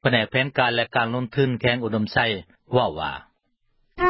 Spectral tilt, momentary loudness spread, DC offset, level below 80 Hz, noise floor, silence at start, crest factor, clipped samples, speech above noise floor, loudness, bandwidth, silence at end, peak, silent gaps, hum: -10.5 dB/octave; 9 LU; under 0.1%; -50 dBFS; -69 dBFS; 0.05 s; 20 dB; under 0.1%; 46 dB; -23 LUFS; 5.8 kHz; 0 s; -4 dBFS; none; none